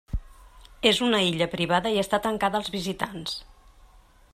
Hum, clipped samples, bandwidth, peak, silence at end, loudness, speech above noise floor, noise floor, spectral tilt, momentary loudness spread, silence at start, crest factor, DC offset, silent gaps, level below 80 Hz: none; under 0.1%; 15 kHz; -4 dBFS; 0.85 s; -25 LUFS; 29 dB; -54 dBFS; -4 dB/octave; 12 LU; 0.1 s; 24 dB; under 0.1%; none; -44 dBFS